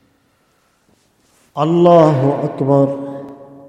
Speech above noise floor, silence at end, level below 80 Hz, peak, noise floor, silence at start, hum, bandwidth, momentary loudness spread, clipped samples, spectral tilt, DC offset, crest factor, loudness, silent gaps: 47 dB; 0.25 s; -60 dBFS; 0 dBFS; -59 dBFS; 1.55 s; none; 9 kHz; 21 LU; under 0.1%; -9 dB/octave; under 0.1%; 16 dB; -13 LUFS; none